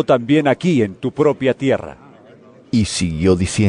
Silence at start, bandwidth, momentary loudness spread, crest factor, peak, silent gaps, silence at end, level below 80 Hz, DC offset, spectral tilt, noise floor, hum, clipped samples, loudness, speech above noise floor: 0 s; 11 kHz; 7 LU; 14 dB; -2 dBFS; none; 0 s; -44 dBFS; under 0.1%; -6 dB/octave; -44 dBFS; none; under 0.1%; -17 LUFS; 28 dB